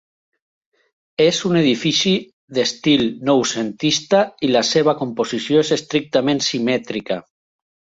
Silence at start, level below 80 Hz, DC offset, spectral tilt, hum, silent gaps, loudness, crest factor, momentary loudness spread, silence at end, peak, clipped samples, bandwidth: 1.2 s; -58 dBFS; under 0.1%; -4 dB/octave; none; 2.33-2.48 s; -18 LUFS; 16 dB; 7 LU; 0.65 s; -2 dBFS; under 0.1%; 8 kHz